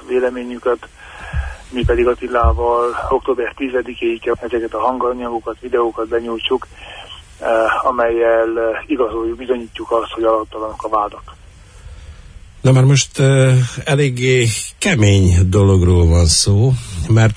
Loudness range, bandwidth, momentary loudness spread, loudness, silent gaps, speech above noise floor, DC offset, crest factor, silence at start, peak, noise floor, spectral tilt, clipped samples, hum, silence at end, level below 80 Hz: 7 LU; 11 kHz; 13 LU; -16 LUFS; none; 24 dB; under 0.1%; 14 dB; 0.05 s; -2 dBFS; -39 dBFS; -5.5 dB/octave; under 0.1%; none; 0 s; -30 dBFS